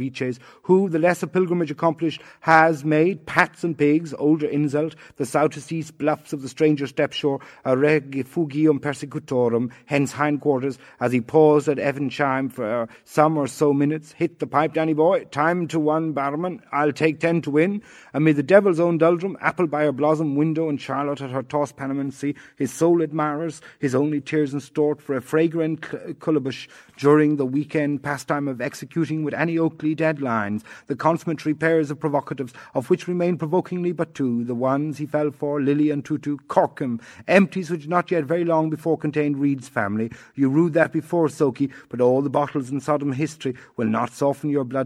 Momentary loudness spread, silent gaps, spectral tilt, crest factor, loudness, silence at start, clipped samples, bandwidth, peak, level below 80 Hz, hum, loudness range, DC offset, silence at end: 9 LU; none; -7 dB/octave; 22 dB; -22 LUFS; 0 s; under 0.1%; 13.5 kHz; 0 dBFS; -68 dBFS; none; 4 LU; under 0.1%; 0 s